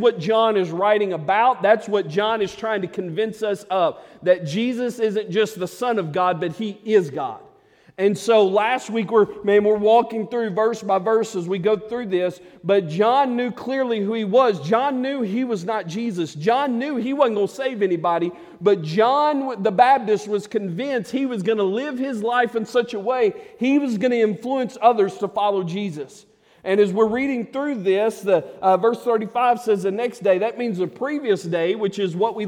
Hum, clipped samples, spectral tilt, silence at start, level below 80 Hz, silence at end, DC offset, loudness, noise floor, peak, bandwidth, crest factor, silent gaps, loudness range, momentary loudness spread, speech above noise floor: none; under 0.1%; -6 dB/octave; 0 s; -66 dBFS; 0 s; under 0.1%; -21 LUFS; -52 dBFS; -2 dBFS; 14.5 kHz; 18 dB; none; 3 LU; 8 LU; 32 dB